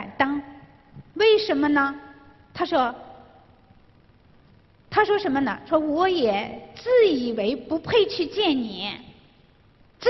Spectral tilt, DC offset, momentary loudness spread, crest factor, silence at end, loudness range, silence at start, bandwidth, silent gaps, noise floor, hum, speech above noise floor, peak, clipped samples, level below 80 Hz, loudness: -6 dB/octave; under 0.1%; 14 LU; 20 dB; 0 s; 5 LU; 0 s; 6 kHz; none; -56 dBFS; none; 34 dB; -4 dBFS; under 0.1%; -56 dBFS; -23 LUFS